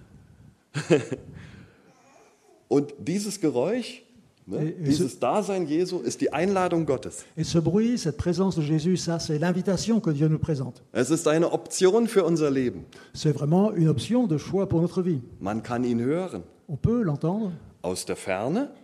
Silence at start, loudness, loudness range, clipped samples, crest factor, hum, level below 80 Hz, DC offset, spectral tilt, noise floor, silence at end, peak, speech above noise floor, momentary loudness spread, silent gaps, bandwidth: 0 s; -25 LUFS; 5 LU; under 0.1%; 20 dB; none; -52 dBFS; under 0.1%; -6 dB/octave; -58 dBFS; 0.1 s; -4 dBFS; 33 dB; 10 LU; none; 13.5 kHz